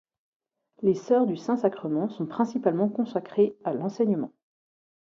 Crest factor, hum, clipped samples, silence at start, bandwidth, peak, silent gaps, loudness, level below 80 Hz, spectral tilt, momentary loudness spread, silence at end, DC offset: 18 dB; none; under 0.1%; 0.8 s; 7.4 kHz; -8 dBFS; none; -26 LUFS; -74 dBFS; -8 dB/octave; 7 LU; 0.85 s; under 0.1%